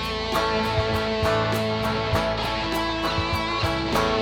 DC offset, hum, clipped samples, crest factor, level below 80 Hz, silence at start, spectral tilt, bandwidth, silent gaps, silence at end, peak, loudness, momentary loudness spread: under 0.1%; none; under 0.1%; 16 dB; -38 dBFS; 0 s; -5 dB/octave; 19 kHz; none; 0 s; -8 dBFS; -24 LUFS; 2 LU